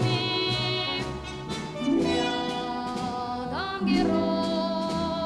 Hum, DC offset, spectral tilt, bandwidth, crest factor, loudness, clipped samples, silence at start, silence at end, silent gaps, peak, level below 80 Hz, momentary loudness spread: none; under 0.1%; -5.5 dB/octave; 12.5 kHz; 14 dB; -27 LUFS; under 0.1%; 0 s; 0 s; none; -12 dBFS; -50 dBFS; 8 LU